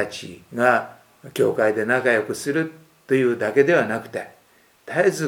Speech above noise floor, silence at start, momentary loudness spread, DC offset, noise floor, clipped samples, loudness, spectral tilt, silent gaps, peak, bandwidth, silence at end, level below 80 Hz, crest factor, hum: 36 dB; 0 s; 15 LU; under 0.1%; -57 dBFS; under 0.1%; -21 LUFS; -5.5 dB/octave; none; -2 dBFS; 17.5 kHz; 0 s; -68 dBFS; 20 dB; none